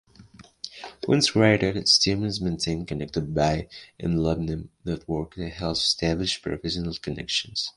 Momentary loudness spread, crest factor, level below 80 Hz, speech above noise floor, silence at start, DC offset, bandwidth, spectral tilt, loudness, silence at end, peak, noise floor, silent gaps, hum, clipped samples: 15 LU; 22 dB; -44 dBFS; 25 dB; 0.2 s; under 0.1%; 11.5 kHz; -4.5 dB/octave; -24 LUFS; 0.05 s; -4 dBFS; -50 dBFS; none; none; under 0.1%